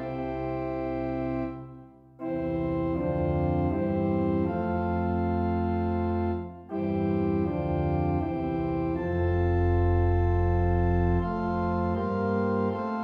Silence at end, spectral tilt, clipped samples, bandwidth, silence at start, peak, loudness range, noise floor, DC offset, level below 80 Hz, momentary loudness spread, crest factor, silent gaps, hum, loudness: 0 s; -11 dB/octave; under 0.1%; 5 kHz; 0 s; -14 dBFS; 4 LU; -49 dBFS; under 0.1%; -38 dBFS; 7 LU; 14 dB; none; none; -28 LUFS